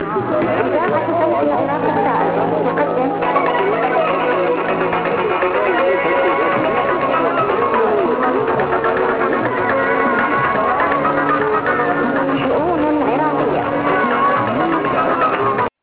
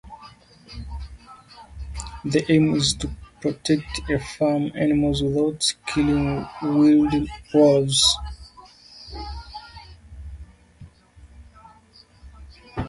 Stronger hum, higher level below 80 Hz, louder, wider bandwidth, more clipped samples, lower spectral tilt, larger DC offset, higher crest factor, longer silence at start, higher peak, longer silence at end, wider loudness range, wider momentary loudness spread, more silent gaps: neither; second, -48 dBFS vs -40 dBFS; first, -16 LUFS vs -21 LUFS; second, 4 kHz vs 11.5 kHz; neither; first, -9.5 dB/octave vs -4.5 dB/octave; neither; about the same, 14 dB vs 18 dB; about the same, 0 s vs 0.05 s; about the same, -2 dBFS vs -4 dBFS; first, 0.15 s vs 0 s; second, 1 LU vs 21 LU; second, 2 LU vs 24 LU; neither